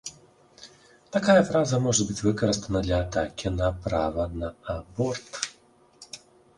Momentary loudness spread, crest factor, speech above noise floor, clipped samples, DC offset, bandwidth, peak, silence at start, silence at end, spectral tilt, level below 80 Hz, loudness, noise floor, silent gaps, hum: 15 LU; 22 dB; 33 dB; under 0.1%; under 0.1%; 11.5 kHz; -6 dBFS; 0.05 s; 0.4 s; -5 dB/octave; -42 dBFS; -26 LUFS; -58 dBFS; none; none